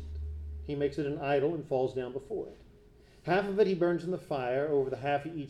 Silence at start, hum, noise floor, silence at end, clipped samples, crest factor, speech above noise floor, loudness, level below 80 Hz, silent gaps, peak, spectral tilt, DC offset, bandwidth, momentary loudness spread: 0 s; none; -58 dBFS; 0 s; under 0.1%; 18 dB; 27 dB; -32 LUFS; -48 dBFS; none; -14 dBFS; -7.5 dB/octave; under 0.1%; 10.5 kHz; 13 LU